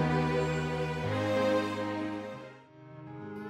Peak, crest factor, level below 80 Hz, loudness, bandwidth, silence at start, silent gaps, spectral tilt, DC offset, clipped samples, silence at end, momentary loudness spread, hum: -16 dBFS; 16 dB; -54 dBFS; -31 LUFS; 13 kHz; 0 s; none; -6.5 dB/octave; under 0.1%; under 0.1%; 0 s; 21 LU; none